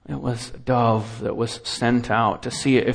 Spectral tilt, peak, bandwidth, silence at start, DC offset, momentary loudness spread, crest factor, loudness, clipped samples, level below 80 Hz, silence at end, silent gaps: -5.5 dB/octave; -6 dBFS; 10.5 kHz; 0.1 s; under 0.1%; 8 LU; 16 dB; -23 LUFS; under 0.1%; -48 dBFS; 0 s; none